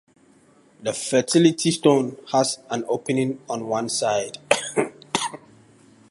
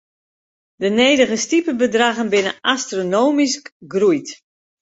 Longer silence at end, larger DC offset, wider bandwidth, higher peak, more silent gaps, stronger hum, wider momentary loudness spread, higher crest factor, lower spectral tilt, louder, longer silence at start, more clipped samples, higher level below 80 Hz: first, 0.75 s vs 0.6 s; neither; first, 11.5 kHz vs 8.2 kHz; about the same, 0 dBFS vs -2 dBFS; second, none vs 3.72-3.80 s; neither; about the same, 10 LU vs 9 LU; first, 22 dB vs 16 dB; about the same, -4 dB/octave vs -3 dB/octave; second, -22 LUFS vs -17 LUFS; about the same, 0.8 s vs 0.8 s; neither; second, -68 dBFS vs -62 dBFS